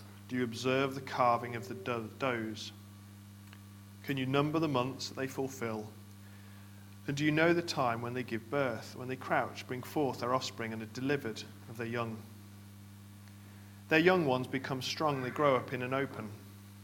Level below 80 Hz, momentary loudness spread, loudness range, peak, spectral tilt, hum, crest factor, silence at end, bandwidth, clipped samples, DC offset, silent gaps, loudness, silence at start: -72 dBFS; 23 LU; 5 LU; -10 dBFS; -5.5 dB/octave; 50 Hz at -50 dBFS; 24 dB; 0 s; 17.5 kHz; under 0.1%; under 0.1%; none; -34 LUFS; 0 s